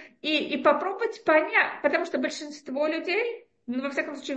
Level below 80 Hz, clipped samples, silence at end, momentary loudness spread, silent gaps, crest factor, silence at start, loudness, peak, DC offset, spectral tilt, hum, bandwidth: -78 dBFS; under 0.1%; 0 s; 10 LU; none; 20 dB; 0 s; -26 LUFS; -8 dBFS; under 0.1%; -3 dB/octave; none; 8.6 kHz